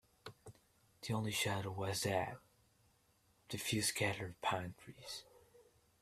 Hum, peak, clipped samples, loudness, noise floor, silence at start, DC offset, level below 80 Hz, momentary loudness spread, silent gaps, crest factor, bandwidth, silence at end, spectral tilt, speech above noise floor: none; -20 dBFS; under 0.1%; -40 LUFS; -74 dBFS; 0.25 s; under 0.1%; -72 dBFS; 19 LU; none; 22 dB; 15.5 kHz; 0.4 s; -3.5 dB/octave; 34 dB